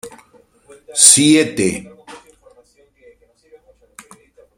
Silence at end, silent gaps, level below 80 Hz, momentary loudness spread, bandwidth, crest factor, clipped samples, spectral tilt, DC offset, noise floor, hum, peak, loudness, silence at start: 2.45 s; none; -56 dBFS; 16 LU; 16 kHz; 18 dB; under 0.1%; -2 dB/octave; under 0.1%; -53 dBFS; none; 0 dBFS; -11 LUFS; 0.05 s